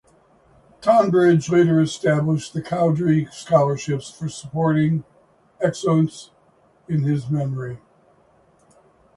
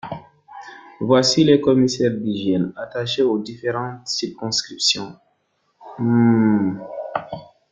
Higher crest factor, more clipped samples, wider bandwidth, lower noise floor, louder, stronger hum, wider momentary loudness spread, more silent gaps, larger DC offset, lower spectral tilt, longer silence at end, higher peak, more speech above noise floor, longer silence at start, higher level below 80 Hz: about the same, 18 dB vs 18 dB; neither; first, 11.5 kHz vs 9.4 kHz; second, -57 dBFS vs -67 dBFS; about the same, -20 LUFS vs -19 LUFS; neither; second, 12 LU vs 21 LU; neither; neither; first, -7 dB/octave vs -5 dB/octave; first, 1.4 s vs 0.25 s; about the same, -4 dBFS vs -2 dBFS; second, 38 dB vs 49 dB; first, 0.8 s vs 0.05 s; about the same, -58 dBFS vs -58 dBFS